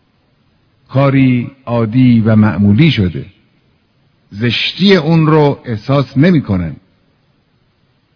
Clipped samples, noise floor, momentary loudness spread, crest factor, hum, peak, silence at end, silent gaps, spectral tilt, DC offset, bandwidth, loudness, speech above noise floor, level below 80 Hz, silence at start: 0.4%; -56 dBFS; 9 LU; 12 dB; none; 0 dBFS; 1.4 s; none; -8.5 dB/octave; under 0.1%; 5.4 kHz; -11 LUFS; 46 dB; -44 dBFS; 0.9 s